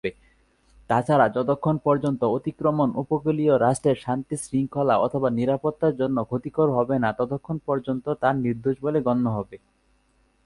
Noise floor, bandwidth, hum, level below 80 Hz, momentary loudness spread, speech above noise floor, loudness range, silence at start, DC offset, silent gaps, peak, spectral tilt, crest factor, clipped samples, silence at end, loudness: -64 dBFS; 11.5 kHz; none; -56 dBFS; 7 LU; 41 dB; 3 LU; 0.05 s; under 0.1%; none; -4 dBFS; -7.5 dB/octave; 18 dB; under 0.1%; 0.9 s; -24 LUFS